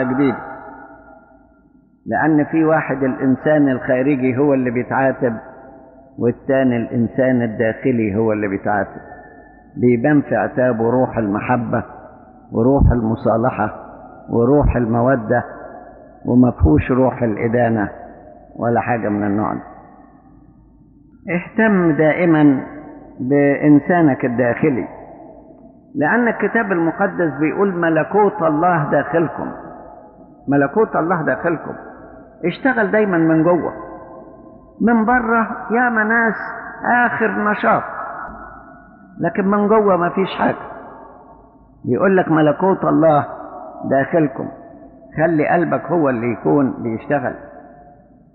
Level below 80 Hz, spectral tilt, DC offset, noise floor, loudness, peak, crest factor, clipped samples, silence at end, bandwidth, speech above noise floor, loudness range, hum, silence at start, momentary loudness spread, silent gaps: -36 dBFS; -7 dB/octave; under 0.1%; -52 dBFS; -17 LUFS; -2 dBFS; 14 dB; under 0.1%; 0.7 s; 4.3 kHz; 36 dB; 3 LU; none; 0 s; 17 LU; none